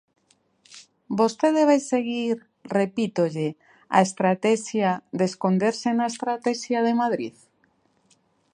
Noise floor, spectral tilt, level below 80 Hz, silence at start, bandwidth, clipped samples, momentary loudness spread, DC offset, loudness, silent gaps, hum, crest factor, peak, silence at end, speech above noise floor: -66 dBFS; -5.5 dB/octave; -74 dBFS; 0.75 s; 11 kHz; under 0.1%; 8 LU; under 0.1%; -24 LUFS; none; none; 22 dB; -4 dBFS; 1.25 s; 43 dB